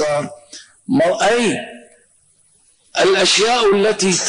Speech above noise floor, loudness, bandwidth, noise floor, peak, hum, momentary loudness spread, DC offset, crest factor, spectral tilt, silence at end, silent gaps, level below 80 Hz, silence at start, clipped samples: 41 dB; -15 LUFS; 10.5 kHz; -56 dBFS; -6 dBFS; none; 19 LU; under 0.1%; 12 dB; -3 dB/octave; 0 s; none; -56 dBFS; 0 s; under 0.1%